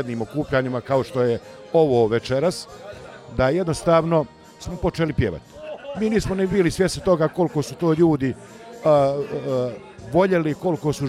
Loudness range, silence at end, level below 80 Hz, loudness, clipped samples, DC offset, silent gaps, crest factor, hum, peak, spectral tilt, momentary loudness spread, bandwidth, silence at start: 2 LU; 0 s; -44 dBFS; -21 LUFS; under 0.1%; under 0.1%; none; 16 dB; none; -6 dBFS; -6.5 dB/octave; 17 LU; 14.5 kHz; 0 s